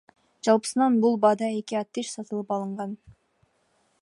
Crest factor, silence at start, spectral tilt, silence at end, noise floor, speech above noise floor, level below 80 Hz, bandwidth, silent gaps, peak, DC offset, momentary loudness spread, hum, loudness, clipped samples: 20 dB; 0.45 s; -5 dB/octave; 0.9 s; -68 dBFS; 44 dB; -70 dBFS; 11.5 kHz; none; -6 dBFS; under 0.1%; 12 LU; none; -25 LUFS; under 0.1%